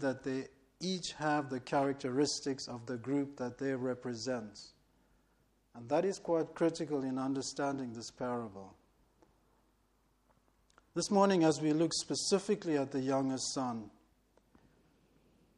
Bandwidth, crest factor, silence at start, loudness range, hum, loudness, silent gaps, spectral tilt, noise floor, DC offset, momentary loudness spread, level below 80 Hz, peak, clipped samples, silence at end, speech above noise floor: 11.5 kHz; 22 dB; 0 s; 8 LU; none; -35 LUFS; none; -4.5 dB/octave; -73 dBFS; under 0.1%; 11 LU; -72 dBFS; -14 dBFS; under 0.1%; 1.7 s; 39 dB